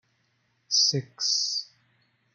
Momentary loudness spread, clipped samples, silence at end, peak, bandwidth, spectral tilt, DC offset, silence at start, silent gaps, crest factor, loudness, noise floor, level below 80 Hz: 7 LU; under 0.1%; 0.7 s; -12 dBFS; 11.5 kHz; -1.5 dB/octave; under 0.1%; 0.7 s; none; 18 dB; -24 LUFS; -71 dBFS; -78 dBFS